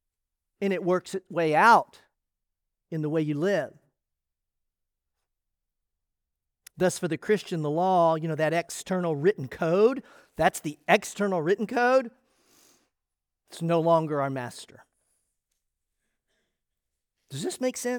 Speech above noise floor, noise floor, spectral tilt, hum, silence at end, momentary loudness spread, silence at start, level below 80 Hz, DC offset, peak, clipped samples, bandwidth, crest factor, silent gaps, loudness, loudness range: 60 dB; -86 dBFS; -5.5 dB/octave; none; 0 s; 13 LU; 0.6 s; -68 dBFS; under 0.1%; -6 dBFS; under 0.1%; over 20 kHz; 22 dB; none; -26 LUFS; 10 LU